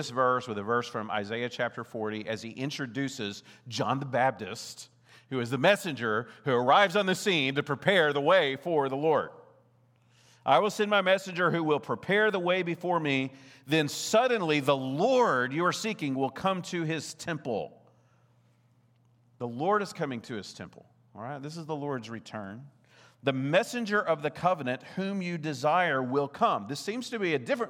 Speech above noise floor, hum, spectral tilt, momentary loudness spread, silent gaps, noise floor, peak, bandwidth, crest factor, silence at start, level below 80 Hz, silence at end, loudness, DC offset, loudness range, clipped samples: 36 dB; none; -4.5 dB/octave; 14 LU; none; -65 dBFS; -8 dBFS; 17 kHz; 22 dB; 0 s; -78 dBFS; 0 s; -28 LUFS; under 0.1%; 10 LU; under 0.1%